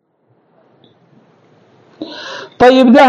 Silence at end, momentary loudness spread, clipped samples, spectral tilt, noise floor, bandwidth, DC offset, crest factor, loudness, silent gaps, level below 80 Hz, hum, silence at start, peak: 0 s; 23 LU; 0.3%; -5.5 dB/octave; -57 dBFS; 9 kHz; under 0.1%; 14 dB; -9 LUFS; none; -50 dBFS; none; 2 s; 0 dBFS